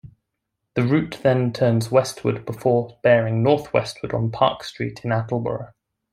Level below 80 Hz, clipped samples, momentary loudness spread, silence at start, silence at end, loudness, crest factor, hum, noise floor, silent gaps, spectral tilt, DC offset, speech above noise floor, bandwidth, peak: -56 dBFS; under 0.1%; 11 LU; 0.05 s; 0.45 s; -21 LUFS; 20 dB; none; -79 dBFS; none; -6.5 dB/octave; under 0.1%; 58 dB; 14 kHz; -2 dBFS